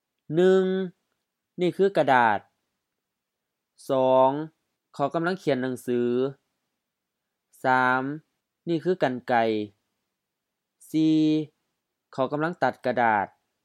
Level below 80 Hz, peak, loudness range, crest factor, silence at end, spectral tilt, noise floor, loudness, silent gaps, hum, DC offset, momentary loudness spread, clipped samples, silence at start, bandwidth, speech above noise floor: -80 dBFS; -6 dBFS; 3 LU; 20 dB; 0.4 s; -7 dB/octave; -84 dBFS; -24 LUFS; none; none; under 0.1%; 14 LU; under 0.1%; 0.3 s; 13.5 kHz; 60 dB